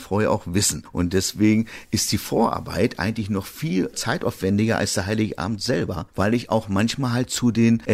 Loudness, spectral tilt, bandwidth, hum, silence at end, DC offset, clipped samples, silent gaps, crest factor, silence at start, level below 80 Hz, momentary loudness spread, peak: -22 LUFS; -5 dB/octave; 15.5 kHz; none; 0 s; under 0.1%; under 0.1%; none; 14 dB; 0 s; -48 dBFS; 6 LU; -8 dBFS